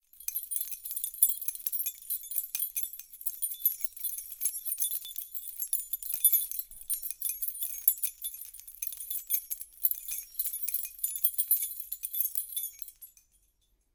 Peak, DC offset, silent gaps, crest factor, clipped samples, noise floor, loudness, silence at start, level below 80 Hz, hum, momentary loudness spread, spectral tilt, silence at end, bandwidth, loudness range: -4 dBFS; under 0.1%; none; 30 dB; under 0.1%; -72 dBFS; -30 LUFS; 0.15 s; -70 dBFS; none; 11 LU; 4 dB/octave; 0.85 s; 19 kHz; 3 LU